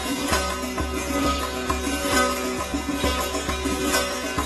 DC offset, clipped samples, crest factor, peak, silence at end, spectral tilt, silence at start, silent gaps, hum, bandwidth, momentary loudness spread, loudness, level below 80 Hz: under 0.1%; under 0.1%; 18 dB; -8 dBFS; 0 s; -3.5 dB/octave; 0 s; none; none; 12.5 kHz; 6 LU; -24 LUFS; -36 dBFS